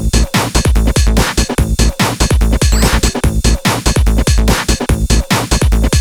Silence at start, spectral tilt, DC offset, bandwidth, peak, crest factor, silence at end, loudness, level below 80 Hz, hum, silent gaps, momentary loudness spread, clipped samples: 0 s; -4.5 dB/octave; under 0.1%; 19 kHz; 0 dBFS; 10 dB; 0 s; -13 LUFS; -14 dBFS; none; none; 2 LU; under 0.1%